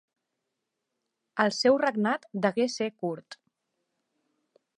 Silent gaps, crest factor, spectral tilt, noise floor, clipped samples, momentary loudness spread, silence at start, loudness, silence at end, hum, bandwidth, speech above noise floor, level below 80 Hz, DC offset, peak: none; 24 dB; -4.5 dB/octave; -84 dBFS; under 0.1%; 12 LU; 1.35 s; -27 LUFS; 1.45 s; none; 10.5 kHz; 57 dB; -80 dBFS; under 0.1%; -8 dBFS